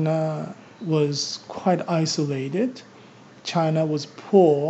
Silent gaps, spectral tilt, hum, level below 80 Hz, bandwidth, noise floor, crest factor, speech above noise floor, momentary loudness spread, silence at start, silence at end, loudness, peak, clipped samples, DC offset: none; -6 dB/octave; none; -76 dBFS; 8 kHz; -47 dBFS; 18 dB; 25 dB; 12 LU; 0 s; 0 s; -23 LUFS; -4 dBFS; under 0.1%; under 0.1%